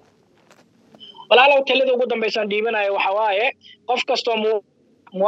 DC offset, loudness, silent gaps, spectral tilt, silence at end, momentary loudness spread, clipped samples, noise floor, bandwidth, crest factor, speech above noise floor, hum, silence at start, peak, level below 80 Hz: under 0.1%; -18 LUFS; none; -3.5 dB/octave; 0 s; 10 LU; under 0.1%; -56 dBFS; 8 kHz; 20 dB; 38 dB; none; 1 s; 0 dBFS; -86 dBFS